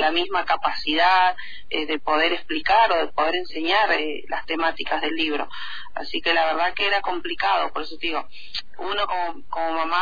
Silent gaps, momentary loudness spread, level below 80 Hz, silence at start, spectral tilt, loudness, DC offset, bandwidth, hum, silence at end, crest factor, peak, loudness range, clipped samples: none; 12 LU; -52 dBFS; 0 s; -4 dB/octave; -22 LUFS; 4%; 5 kHz; none; 0 s; 18 dB; -6 dBFS; 3 LU; under 0.1%